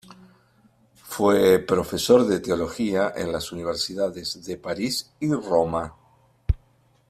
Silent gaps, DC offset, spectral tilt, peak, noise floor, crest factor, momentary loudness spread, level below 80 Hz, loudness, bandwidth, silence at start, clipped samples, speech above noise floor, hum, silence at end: none; under 0.1%; -5 dB/octave; -4 dBFS; -61 dBFS; 20 dB; 13 LU; -42 dBFS; -23 LUFS; 15.5 kHz; 0.1 s; under 0.1%; 38 dB; none; 0.55 s